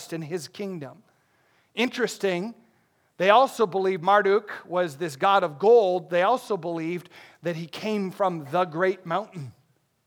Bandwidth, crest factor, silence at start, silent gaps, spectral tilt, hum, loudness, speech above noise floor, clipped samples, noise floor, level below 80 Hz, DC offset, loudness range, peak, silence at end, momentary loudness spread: 18.5 kHz; 22 dB; 0 s; none; -5 dB/octave; none; -24 LUFS; 42 dB; under 0.1%; -66 dBFS; -84 dBFS; under 0.1%; 7 LU; -2 dBFS; 0.55 s; 16 LU